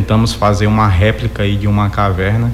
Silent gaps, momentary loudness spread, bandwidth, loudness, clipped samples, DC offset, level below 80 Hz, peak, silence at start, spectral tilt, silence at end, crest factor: none; 4 LU; 13 kHz; -13 LUFS; under 0.1%; under 0.1%; -26 dBFS; -2 dBFS; 0 s; -6.5 dB/octave; 0 s; 12 dB